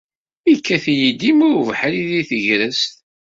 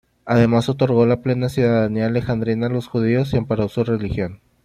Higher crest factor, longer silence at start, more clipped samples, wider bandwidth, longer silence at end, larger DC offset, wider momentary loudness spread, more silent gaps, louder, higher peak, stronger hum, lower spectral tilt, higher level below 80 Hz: about the same, 14 dB vs 16 dB; first, 0.45 s vs 0.25 s; neither; second, 7.8 kHz vs 12.5 kHz; about the same, 0.3 s vs 0.3 s; neither; about the same, 6 LU vs 6 LU; neither; first, -16 LUFS vs -19 LUFS; about the same, -2 dBFS vs -4 dBFS; neither; second, -4.5 dB/octave vs -8 dB/octave; second, -60 dBFS vs -44 dBFS